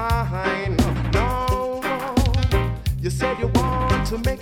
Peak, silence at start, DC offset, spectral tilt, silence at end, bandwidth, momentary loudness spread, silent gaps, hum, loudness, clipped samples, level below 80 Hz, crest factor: -4 dBFS; 0 s; under 0.1%; -6 dB/octave; 0 s; 17 kHz; 4 LU; none; none; -22 LUFS; under 0.1%; -26 dBFS; 16 dB